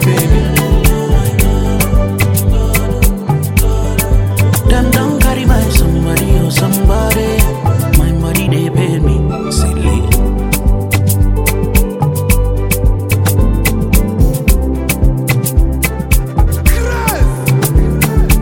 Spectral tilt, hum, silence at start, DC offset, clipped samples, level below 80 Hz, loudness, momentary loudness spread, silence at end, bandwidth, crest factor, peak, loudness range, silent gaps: -5.5 dB/octave; none; 0 s; under 0.1%; under 0.1%; -14 dBFS; -12 LUFS; 3 LU; 0 s; 17.5 kHz; 10 dB; 0 dBFS; 2 LU; none